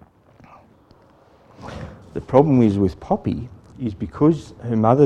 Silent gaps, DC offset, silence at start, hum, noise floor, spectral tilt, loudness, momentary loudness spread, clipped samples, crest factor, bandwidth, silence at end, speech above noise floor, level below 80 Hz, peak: none; under 0.1%; 1.6 s; none; -52 dBFS; -9.5 dB/octave; -20 LUFS; 20 LU; under 0.1%; 20 dB; 9.4 kHz; 0 s; 34 dB; -46 dBFS; 0 dBFS